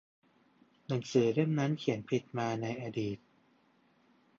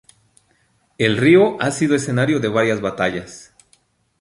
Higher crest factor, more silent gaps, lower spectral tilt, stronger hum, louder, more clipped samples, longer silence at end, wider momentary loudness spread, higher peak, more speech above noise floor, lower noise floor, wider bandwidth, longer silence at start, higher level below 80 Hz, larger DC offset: about the same, 20 dB vs 18 dB; neither; first, -7 dB/octave vs -5.5 dB/octave; neither; second, -33 LUFS vs -17 LUFS; neither; first, 1.25 s vs 0.8 s; about the same, 9 LU vs 9 LU; second, -14 dBFS vs -2 dBFS; second, 37 dB vs 45 dB; first, -69 dBFS vs -61 dBFS; second, 7.6 kHz vs 11.5 kHz; about the same, 0.9 s vs 1 s; second, -72 dBFS vs -54 dBFS; neither